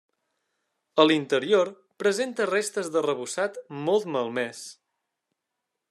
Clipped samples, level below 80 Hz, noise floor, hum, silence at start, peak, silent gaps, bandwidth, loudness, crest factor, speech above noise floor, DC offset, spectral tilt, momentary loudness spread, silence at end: under 0.1%; -82 dBFS; -83 dBFS; none; 0.95 s; -6 dBFS; none; 13 kHz; -26 LUFS; 22 dB; 58 dB; under 0.1%; -4 dB/octave; 10 LU; 1.2 s